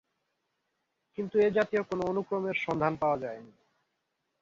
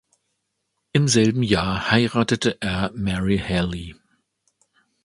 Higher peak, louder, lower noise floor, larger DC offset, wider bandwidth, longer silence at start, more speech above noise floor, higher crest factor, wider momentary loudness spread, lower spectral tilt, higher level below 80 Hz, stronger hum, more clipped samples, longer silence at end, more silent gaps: second, -14 dBFS vs 0 dBFS; second, -30 LUFS vs -21 LUFS; first, -81 dBFS vs -76 dBFS; neither; second, 7.4 kHz vs 11.5 kHz; first, 1.2 s vs 0.95 s; second, 51 dB vs 55 dB; about the same, 18 dB vs 22 dB; first, 14 LU vs 7 LU; first, -7 dB/octave vs -5 dB/octave; second, -66 dBFS vs -42 dBFS; neither; neither; second, 0.95 s vs 1.1 s; neither